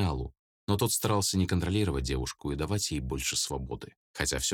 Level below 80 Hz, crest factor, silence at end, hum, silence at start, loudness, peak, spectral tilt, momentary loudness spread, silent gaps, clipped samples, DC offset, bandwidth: -42 dBFS; 20 dB; 0 s; none; 0 s; -30 LUFS; -10 dBFS; -4 dB/octave; 13 LU; 0.39-0.67 s, 3.97-4.14 s; under 0.1%; under 0.1%; 18.5 kHz